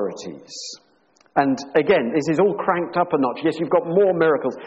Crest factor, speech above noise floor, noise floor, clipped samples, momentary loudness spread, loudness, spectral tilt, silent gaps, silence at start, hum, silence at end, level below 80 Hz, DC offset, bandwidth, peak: 16 dB; 39 dB; -59 dBFS; under 0.1%; 15 LU; -20 LUFS; -6 dB/octave; none; 0 s; none; 0 s; -62 dBFS; under 0.1%; 8.2 kHz; -4 dBFS